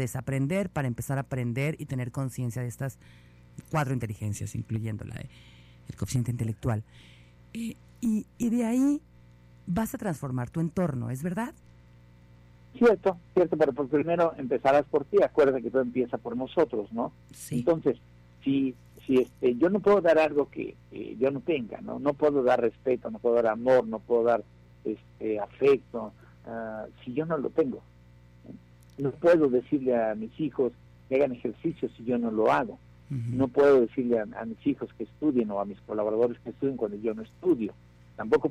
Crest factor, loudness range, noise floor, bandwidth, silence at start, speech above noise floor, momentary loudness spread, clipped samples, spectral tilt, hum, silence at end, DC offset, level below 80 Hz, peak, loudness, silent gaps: 14 dB; 8 LU; -54 dBFS; 15.5 kHz; 0 s; 27 dB; 14 LU; under 0.1%; -7.5 dB/octave; 60 Hz at -55 dBFS; 0 s; under 0.1%; -58 dBFS; -14 dBFS; -28 LUFS; none